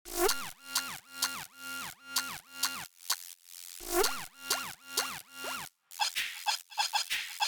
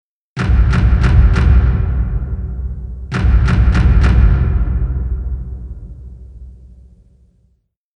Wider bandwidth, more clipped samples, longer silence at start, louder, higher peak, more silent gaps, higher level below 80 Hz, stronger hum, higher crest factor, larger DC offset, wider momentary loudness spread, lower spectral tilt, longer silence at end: first, over 20 kHz vs 6.4 kHz; neither; second, 0.05 s vs 0.35 s; second, -34 LUFS vs -15 LUFS; second, -14 dBFS vs 0 dBFS; neither; second, -58 dBFS vs -16 dBFS; neither; first, 22 dB vs 14 dB; neither; second, 11 LU vs 19 LU; second, 0 dB/octave vs -8 dB/octave; second, 0 s vs 1.4 s